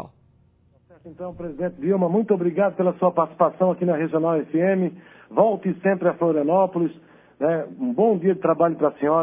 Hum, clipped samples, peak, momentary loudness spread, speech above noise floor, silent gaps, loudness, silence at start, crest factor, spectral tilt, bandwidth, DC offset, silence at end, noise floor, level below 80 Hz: 60 Hz at -60 dBFS; under 0.1%; -4 dBFS; 8 LU; 38 dB; none; -22 LUFS; 0 s; 18 dB; -12.5 dB/octave; 3.7 kHz; under 0.1%; 0 s; -59 dBFS; -64 dBFS